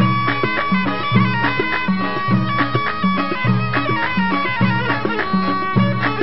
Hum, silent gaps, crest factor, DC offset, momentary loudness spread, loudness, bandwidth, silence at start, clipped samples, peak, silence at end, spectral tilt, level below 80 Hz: none; none; 16 dB; 4%; 2 LU; -18 LUFS; 5.8 kHz; 0 s; under 0.1%; -2 dBFS; 0 s; -11.5 dB/octave; -46 dBFS